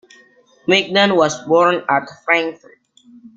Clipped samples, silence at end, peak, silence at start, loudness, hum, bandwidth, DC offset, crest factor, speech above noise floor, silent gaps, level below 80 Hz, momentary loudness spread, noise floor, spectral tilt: under 0.1%; 0.8 s; 0 dBFS; 0.7 s; -16 LUFS; none; 7.8 kHz; under 0.1%; 18 dB; 35 dB; none; -62 dBFS; 6 LU; -51 dBFS; -4 dB/octave